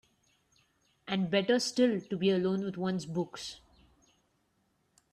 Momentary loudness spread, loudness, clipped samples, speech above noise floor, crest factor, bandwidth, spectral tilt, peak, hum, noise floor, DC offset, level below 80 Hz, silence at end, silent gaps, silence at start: 15 LU; -31 LUFS; under 0.1%; 44 dB; 20 dB; 12.5 kHz; -5.5 dB/octave; -14 dBFS; none; -75 dBFS; under 0.1%; -72 dBFS; 1.55 s; none; 1.05 s